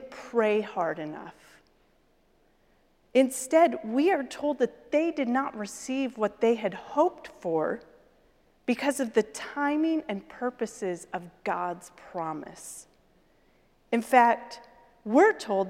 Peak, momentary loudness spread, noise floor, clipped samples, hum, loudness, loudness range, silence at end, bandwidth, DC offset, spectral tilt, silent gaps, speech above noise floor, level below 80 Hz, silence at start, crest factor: -6 dBFS; 16 LU; -65 dBFS; under 0.1%; none; -27 LUFS; 7 LU; 0 s; 16.5 kHz; under 0.1%; -4.5 dB/octave; none; 38 dB; -68 dBFS; 0 s; 22 dB